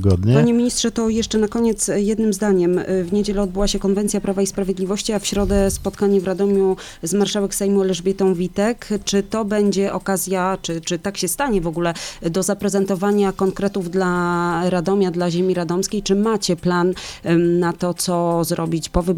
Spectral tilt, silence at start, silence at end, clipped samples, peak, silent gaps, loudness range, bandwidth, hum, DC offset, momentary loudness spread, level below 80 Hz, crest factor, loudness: -5 dB/octave; 0 s; 0 s; under 0.1%; 0 dBFS; none; 2 LU; 17 kHz; none; under 0.1%; 4 LU; -36 dBFS; 18 dB; -19 LUFS